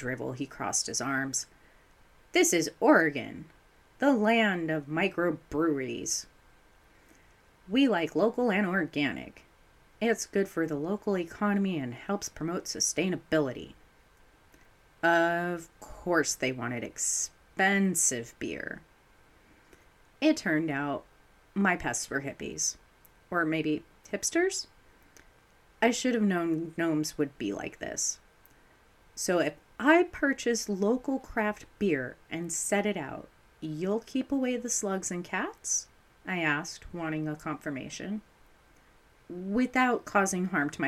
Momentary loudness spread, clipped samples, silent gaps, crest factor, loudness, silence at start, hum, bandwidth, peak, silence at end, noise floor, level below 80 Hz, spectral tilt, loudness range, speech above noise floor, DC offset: 13 LU; under 0.1%; none; 22 dB; -29 LUFS; 0 s; none; 15.5 kHz; -10 dBFS; 0 s; -61 dBFS; -60 dBFS; -3.5 dB/octave; 5 LU; 32 dB; under 0.1%